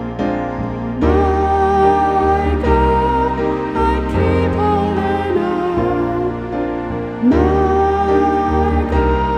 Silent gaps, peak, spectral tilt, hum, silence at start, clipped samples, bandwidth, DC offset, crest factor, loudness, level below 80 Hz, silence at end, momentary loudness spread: none; -2 dBFS; -8.5 dB/octave; none; 0 s; under 0.1%; 9 kHz; under 0.1%; 14 dB; -16 LUFS; -24 dBFS; 0 s; 8 LU